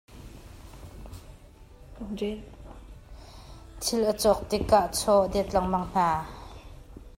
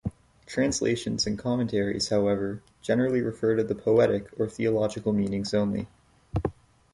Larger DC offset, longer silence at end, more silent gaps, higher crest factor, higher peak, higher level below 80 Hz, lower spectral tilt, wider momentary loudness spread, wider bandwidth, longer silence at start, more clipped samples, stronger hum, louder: neither; second, 0.1 s vs 0.4 s; neither; first, 22 dB vs 16 dB; about the same, -8 dBFS vs -10 dBFS; about the same, -46 dBFS vs -50 dBFS; about the same, -4.5 dB/octave vs -5.5 dB/octave; first, 25 LU vs 10 LU; first, 16 kHz vs 11.5 kHz; about the same, 0.1 s vs 0.05 s; neither; neither; about the same, -26 LUFS vs -27 LUFS